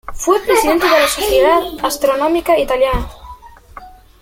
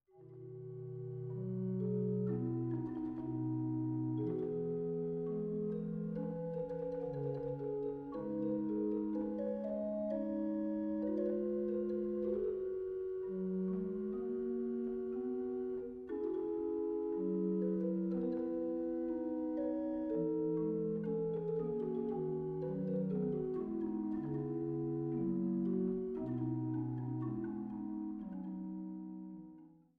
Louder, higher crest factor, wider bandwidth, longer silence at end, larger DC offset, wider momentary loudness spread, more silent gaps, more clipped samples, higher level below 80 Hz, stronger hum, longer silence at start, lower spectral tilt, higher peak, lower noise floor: first, -14 LUFS vs -39 LUFS; about the same, 14 dB vs 12 dB; first, 16.5 kHz vs 3.6 kHz; about the same, 0.35 s vs 0.25 s; neither; about the same, 5 LU vs 6 LU; neither; neither; first, -32 dBFS vs -66 dBFS; neither; about the same, 0.05 s vs 0.15 s; second, -3 dB/octave vs -11.5 dB/octave; first, 0 dBFS vs -26 dBFS; second, -37 dBFS vs -59 dBFS